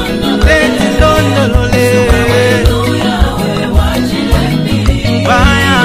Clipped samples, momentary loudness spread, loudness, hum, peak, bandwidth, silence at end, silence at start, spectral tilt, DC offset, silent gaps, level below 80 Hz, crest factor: 0.6%; 4 LU; -10 LUFS; none; 0 dBFS; 15.5 kHz; 0 s; 0 s; -5.5 dB/octave; under 0.1%; none; -16 dBFS; 10 dB